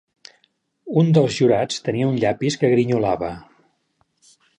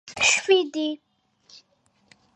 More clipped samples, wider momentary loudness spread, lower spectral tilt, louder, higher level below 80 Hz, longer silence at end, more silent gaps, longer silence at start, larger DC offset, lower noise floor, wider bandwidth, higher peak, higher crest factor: neither; second, 8 LU vs 13 LU; first, -6.5 dB/octave vs -0.5 dB/octave; about the same, -19 LUFS vs -21 LUFS; first, -54 dBFS vs -64 dBFS; second, 1.2 s vs 1.4 s; neither; first, 0.85 s vs 0.05 s; neither; about the same, -67 dBFS vs -66 dBFS; about the same, 10 kHz vs 9.8 kHz; about the same, -4 dBFS vs -4 dBFS; about the same, 18 dB vs 22 dB